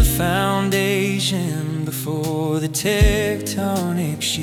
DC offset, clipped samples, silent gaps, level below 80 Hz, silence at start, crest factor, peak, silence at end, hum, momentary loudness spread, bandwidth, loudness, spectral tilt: under 0.1%; under 0.1%; none; -28 dBFS; 0 s; 16 dB; -4 dBFS; 0 s; none; 7 LU; 20 kHz; -20 LUFS; -4.5 dB/octave